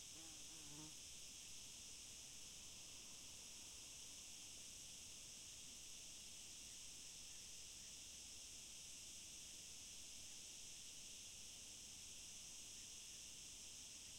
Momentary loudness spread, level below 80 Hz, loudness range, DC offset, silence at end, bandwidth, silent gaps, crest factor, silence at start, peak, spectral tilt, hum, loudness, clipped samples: 1 LU; -76 dBFS; 1 LU; under 0.1%; 0 s; 16.5 kHz; none; 14 dB; 0 s; -44 dBFS; 0 dB/octave; none; -55 LUFS; under 0.1%